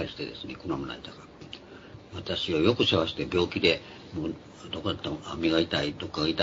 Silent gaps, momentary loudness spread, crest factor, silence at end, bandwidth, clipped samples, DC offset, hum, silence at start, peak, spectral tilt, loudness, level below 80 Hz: none; 20 LU; 22 dB; 0 s; 7.8 kHz; under 0.1%; under 0.1%; none; 0 s; -8 dBFS; -5.5 dB/octave; -28 LUFS; -56 dBFS